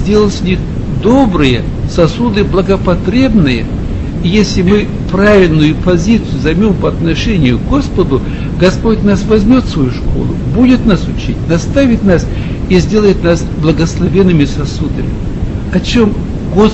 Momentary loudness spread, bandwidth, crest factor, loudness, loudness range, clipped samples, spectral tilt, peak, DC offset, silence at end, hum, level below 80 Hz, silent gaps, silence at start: 8 LU; 8.2 kHz; 10 dB; -11 LUFS; 2 LU; 0.3%; -7 dB/octave; 0 dBFS; under 0.1%; 0 s; none; -20 dBFS; none; 0 s